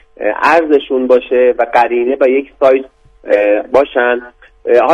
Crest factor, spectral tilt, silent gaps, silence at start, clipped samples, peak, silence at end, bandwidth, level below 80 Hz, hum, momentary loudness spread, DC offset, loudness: 12 dB; -5 dB/octave; none; 0.2 s; 0.3%; 0 dBFS; 0 s; 7.8 kHz; -48 dBFS; none; 5 LU; under 0.1%; -12 LUFS